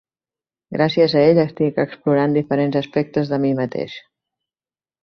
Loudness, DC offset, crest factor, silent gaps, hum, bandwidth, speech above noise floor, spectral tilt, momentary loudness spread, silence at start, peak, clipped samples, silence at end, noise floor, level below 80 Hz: -18 LUFS; under 0.1%; 18 dB; none; none; 6.4 kHz; over 72 dB; -8.5 dB/octave; 12 LU; 0.7 s; -2 dBFS; under 0.1%; 1.05 s; under -90 dBFS; -60 dBFS